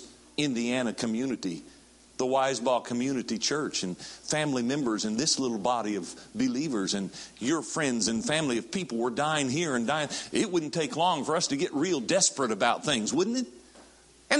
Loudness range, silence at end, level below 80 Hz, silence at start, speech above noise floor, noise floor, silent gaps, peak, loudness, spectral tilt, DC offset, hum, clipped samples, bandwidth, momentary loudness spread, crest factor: 3 LU; 0 s; -66 dBFS; 0 s; 27 dB; -56 dBFS; none; -4 dBFS; -28 LUFS; -3.5 dB/octave; under 0.1%; none; under 0.1%; 11.5 kHz; 7 LU; 24 dB